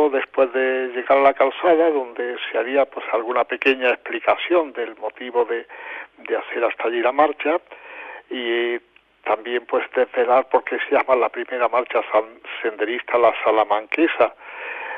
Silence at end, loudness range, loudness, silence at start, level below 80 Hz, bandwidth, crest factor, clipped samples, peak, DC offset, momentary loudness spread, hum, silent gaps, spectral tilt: 0 s; 4 LU; -20 LUFS; 0 s; -68 dBFS; 5.8 kHz; 18 dB; under 0.1%; -4 dBFS; under 0.1%; 13 LU; none; none; -5.5 dB/octave